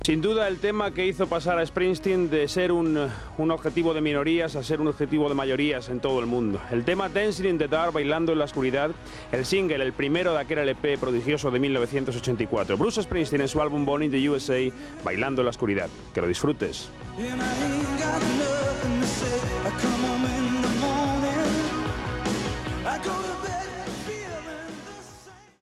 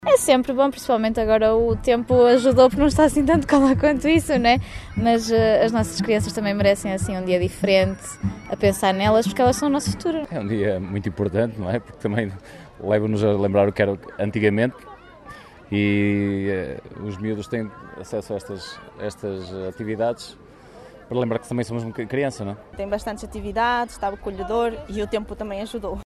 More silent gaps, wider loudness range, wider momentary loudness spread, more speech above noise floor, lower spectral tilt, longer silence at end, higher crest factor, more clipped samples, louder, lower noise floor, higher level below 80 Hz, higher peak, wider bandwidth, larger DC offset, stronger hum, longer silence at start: neither; second, 3 LU vs 11 LU; second, 8 LU vs 14 LU; about the same, 24 dB vs 23 dB; about the same, -5 dB/octave vs -5.5 dB/octave; first, 0.2 s vs 0.05 s; about the same, 16 dB vs 18 dB; neither; second, -26 LUFS vs -21 LUFS; first, -49 dBFS vs -44 dBFS; about the same, -46 dBFS vs -42 dBFS; second, -8 dBFS vs -2 dBFS; about the same, 13.5 kHz vs 13.5 kHz; neither; neither; about the same, 0 s vs 0 s